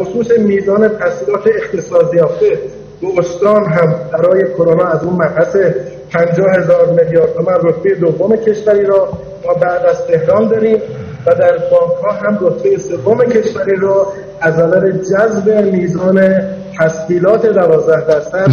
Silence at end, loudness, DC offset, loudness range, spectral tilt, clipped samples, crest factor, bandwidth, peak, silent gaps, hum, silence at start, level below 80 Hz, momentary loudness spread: 0 s; -12 LUFS; under 0.1%; 1 LU; -7.5 dB/octave; under 0.1%; 10 dB; 6.8 kHz; 0 dBFS; none; none; 0 s; -48 dBFS; 6 LU